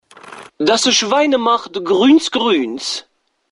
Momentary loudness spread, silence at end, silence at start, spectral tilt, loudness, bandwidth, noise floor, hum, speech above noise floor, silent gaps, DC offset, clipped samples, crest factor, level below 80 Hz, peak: 10 LU; 0.5 s; 0.25 s; -2.5 dB/octave; -14 LUFS; 11.5 kHz; -37 dBFS; none; 23 dB; none; under 0.1%; under 0.1%; 14 dB; -60 dBFS; -2 dBFS